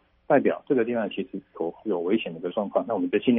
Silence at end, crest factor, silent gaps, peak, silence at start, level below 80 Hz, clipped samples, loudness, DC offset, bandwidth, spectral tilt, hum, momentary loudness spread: 0 s; 18 dB; none; -6 dBFS; 0.3 s; -68 dBFS; under 0.1%; -26 LUFS; under 0.1%; 3.8 kHz; -5 dB/octave; none; 10 LU